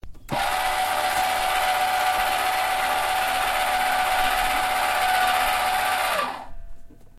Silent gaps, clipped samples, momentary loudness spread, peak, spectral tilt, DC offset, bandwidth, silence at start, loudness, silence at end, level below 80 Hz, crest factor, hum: none; under 0.1%; 3 LU; -8 dBFS; -1 dB/octave; under 0.1%; 16.5 kHz; 0.05 s; -22 LUFS; 0 s; -44 dBFS; 14 dB; none